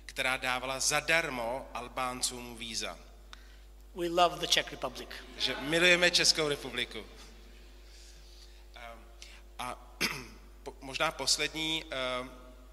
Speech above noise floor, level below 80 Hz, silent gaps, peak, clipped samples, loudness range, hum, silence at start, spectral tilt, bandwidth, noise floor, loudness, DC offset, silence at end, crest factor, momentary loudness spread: 21 dB; -52 dBFS; none; -10 dBFS; under 0.1%; 13 LU; none; 0 s; -1.5 dB/octave; 16 kHz; -52 dBFS; -30 LUFS; under 0.1%; 0 s; 24 dB; 24 LU